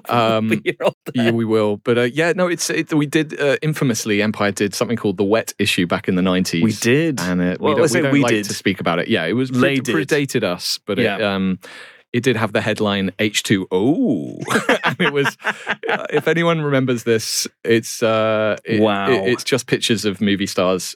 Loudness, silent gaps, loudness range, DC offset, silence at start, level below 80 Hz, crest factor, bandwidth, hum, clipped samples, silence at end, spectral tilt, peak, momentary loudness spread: -18 LUFS; 0.94-1.01 s, 12.08-12.12 s; 2 LU; under 0.1%; 0.05 s; -62 dBFS; 14 dB; 19 kHz; none; under 0.1%; 0 s; -4.5 dB/octave; -4 dBFS; 4 LU